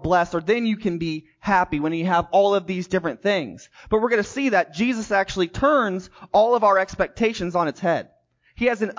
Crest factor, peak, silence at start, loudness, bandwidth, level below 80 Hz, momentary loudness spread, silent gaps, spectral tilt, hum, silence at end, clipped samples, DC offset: 14 dB; -6 dBFS; 0 s; -22 LUFS; 7.6 kHz; -48 dBFS; 7 LU; none; -5.5 dB/octave; none; 0.05 s; under 0.1%; under 0.1%